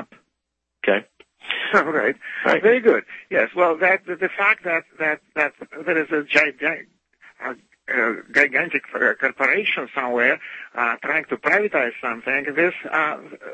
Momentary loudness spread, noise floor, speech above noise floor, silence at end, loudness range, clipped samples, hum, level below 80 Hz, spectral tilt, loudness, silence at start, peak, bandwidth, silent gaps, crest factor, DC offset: 9 LU; -79 dBFS; 58 dB; 0 s; 3 LU; under 0.1%; none; -70 dBFS; -4.5 dB/octave; -20 LUFS; 0 s; -2 dBFS; 8.6 kHz; none; 20 dB; under 0.1%